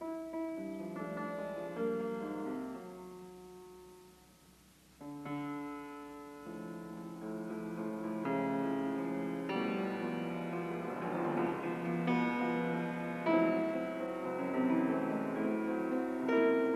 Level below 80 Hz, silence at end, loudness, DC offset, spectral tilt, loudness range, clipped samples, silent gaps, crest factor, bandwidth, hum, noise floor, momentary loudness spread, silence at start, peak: -72 dBFS; 0 s; -37 LUFS; under 0.1%; -7.5 dB/octave; 13 LU; under 0.1%; none; 18 dB; 14 kHz; none; -62 dBFS; 15 LU; 0 s; -20 dBFS